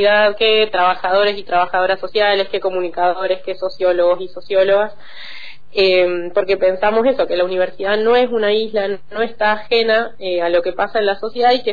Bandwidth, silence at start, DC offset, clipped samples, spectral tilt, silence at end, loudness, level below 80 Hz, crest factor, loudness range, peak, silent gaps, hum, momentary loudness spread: 5 kHz; 0 s; 4%; under 0.1%; -6 dB/octave; 0 s; -16 LUFS; -50 dBFS; 12 dB; 2 LU; -4 dBFS; none; none; 8 LU